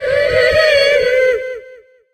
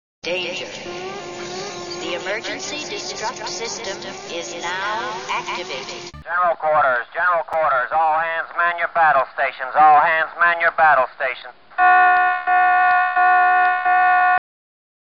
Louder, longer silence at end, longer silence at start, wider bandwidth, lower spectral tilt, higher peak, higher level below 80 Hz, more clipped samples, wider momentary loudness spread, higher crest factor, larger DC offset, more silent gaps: first, -12 LUFS vs -18 LUFS; second, 0.4 s vs 0.8 s; second, 0 s vs 0.25 s; first, 15 kHz vs 7.2 kHz; first, -2.5 dB/octave vs 0.5 dB/octave; first, 0 dBFS vs -4 dBFS; first, -40 dBFS vs -58 dBFS; neither; about the same, 13 LU vs 15 LU; about the same, 14 dB vs 14 dB; second, under 0.1% vs 0.3%; neither